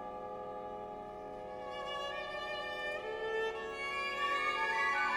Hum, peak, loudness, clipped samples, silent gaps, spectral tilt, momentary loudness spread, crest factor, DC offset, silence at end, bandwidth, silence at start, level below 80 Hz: none; -22 dBFS; -38 LUFS; under 0.1%; none; -2.5 dB/octave; 13 LU; 16 dB; under 0.1%; 0 s; 16 kHz; 0 s; -66 dBFS